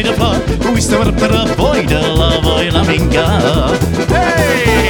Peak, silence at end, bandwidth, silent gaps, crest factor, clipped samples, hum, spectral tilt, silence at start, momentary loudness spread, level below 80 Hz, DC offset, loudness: 0 dBFS; 0 s; 20 kHz; none; 12 dB; under 0.1%; none; -5 dB/octave; 0 s; 2 LU; -20 dBFS; under 0.1%; -12 LUFS